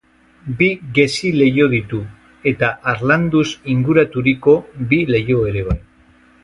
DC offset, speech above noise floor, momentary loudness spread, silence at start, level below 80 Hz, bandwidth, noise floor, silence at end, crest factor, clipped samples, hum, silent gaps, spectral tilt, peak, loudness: under 0.1%; 34 dB; 11 LU; 0.45 s; -38 dBFS; 11.5 kHz; -50 dBFS; 0.65 s; 16 dB; under 0.1%; none; none; -6.5 dB/octave; 0 dBFS; -16 LUFS